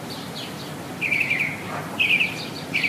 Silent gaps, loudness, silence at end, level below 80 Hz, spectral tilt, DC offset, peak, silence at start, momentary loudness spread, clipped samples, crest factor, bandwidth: none; -23 LUFS; 0 s; -62 dBFS; -3.5 dB/octave; under 0.1%; -10 dBFS; 0 s; 14 LU; under 0.1%; 16 dB; 15.5 kHz